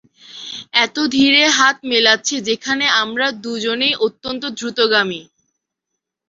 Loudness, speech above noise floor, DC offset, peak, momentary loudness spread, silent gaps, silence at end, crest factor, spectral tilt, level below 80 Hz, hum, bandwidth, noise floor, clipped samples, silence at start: -15 LUFS; 62 dB; under 0.1%; 0 dBFS; 13 LU; none; 1.05 s; 18 dB; -1.5 dB/octave; -60 dBFS; none; 7.8 kHz; -79 dBFS; under 0.1%; 0.3 s